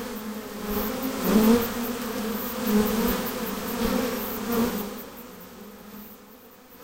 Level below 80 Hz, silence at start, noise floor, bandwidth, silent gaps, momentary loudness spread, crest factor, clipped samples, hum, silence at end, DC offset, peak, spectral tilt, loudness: -46 dBFS; 0 s; -49 dBFS; 17 kHz; none; 21 LU; 20 dB; under 0.1%; none; 0 s; under 0.1%; -8 dBFS; -5 dB/octave; -26 LUFS